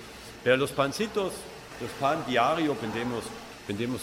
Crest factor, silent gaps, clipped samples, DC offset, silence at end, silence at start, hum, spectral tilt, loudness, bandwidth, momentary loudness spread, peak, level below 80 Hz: 18 dB; none; under 0.1%; under 0.1%; 0 s; 0 s; none; -4.5 dB/octave; -28 LUFS; 16 kHz; 15 LU; -10 dBFS; -58 dBFS